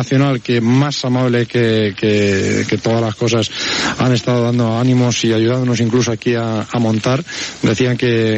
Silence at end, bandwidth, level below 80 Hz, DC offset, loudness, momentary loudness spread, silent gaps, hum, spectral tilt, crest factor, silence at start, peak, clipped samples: 0 s; 8.4 kHz; -50 dBFS; under 0.1%; -15 LUFS; 4 LU; none; none; -5.5 dB/octave; 12 dB; 0 s; -2 dBFS; under 0.1%